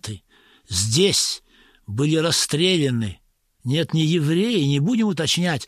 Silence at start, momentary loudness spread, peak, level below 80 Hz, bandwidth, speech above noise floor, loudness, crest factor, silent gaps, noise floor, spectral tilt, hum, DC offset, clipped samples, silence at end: 0.05 s; 13 LU; -6 dBFS; -54 dBFS; 15 kHz; 34 dB; -20 LUFS; 16 dB; none; -54 dBFS; -4.5 dB/octave; none; under 0.1%; under 0.1%; 0 s